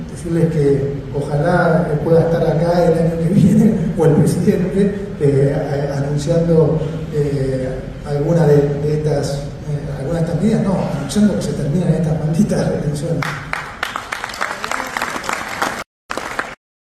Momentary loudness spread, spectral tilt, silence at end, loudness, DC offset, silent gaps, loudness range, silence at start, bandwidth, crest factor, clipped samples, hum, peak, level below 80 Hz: 10 LU; -7 dB/octave; 0.4 s; -17 LUFS; under 0.1%; 15.86-16.09 s; 7 LU; 0 s; 13.5 kHz; 14 dB; under 0.1%; none; -2 dBFS; -36 dBFS